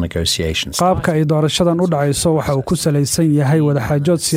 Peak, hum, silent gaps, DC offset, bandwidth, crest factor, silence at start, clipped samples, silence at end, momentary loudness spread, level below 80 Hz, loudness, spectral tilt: -2 dBFS; none; none; under 0.1%; 16 kHz; 12 dB; 0 s; under 0.1%; 0 s; 3 LU; -36 dBFS; -16 LUFS; -5 dB/octave